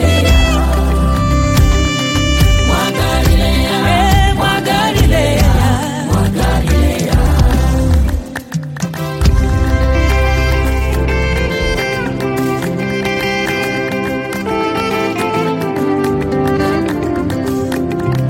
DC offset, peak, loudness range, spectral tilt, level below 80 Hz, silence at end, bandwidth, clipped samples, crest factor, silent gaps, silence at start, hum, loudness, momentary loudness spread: under 0.1%; 0 dBFS; 4 LU; -5.5 dB/octave; -16 dBFS; 0 s; 16.5 kHz; under 0.1%; 12 dB; none; 0 s; none; -14 LUFS; 6 LU